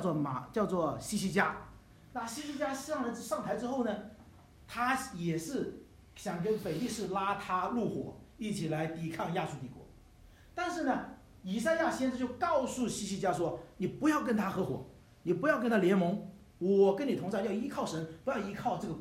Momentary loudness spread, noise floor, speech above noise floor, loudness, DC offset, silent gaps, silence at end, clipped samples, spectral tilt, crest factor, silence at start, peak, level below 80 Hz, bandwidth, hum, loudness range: 13 LU; -58 dBFS; 25 dB; -34 LUFS; under 0.1%; none; 0 s; under 0.1%; -5.5 dB/octave; 20 dB; 0 s; -14 dBFS; -62 dBFS; 16 kHz; none; 6 LU